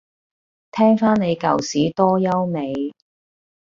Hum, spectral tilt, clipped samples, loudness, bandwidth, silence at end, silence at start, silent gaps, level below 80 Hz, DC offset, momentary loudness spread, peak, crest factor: none; -6.5 dB/octave; under 0.1%; -19 LUFS; 7.6 kHz; 0.85 s; 0.75 s; none; -58 dBFS; under 0.1%; 11 LU; -2 dBFS; 18 dB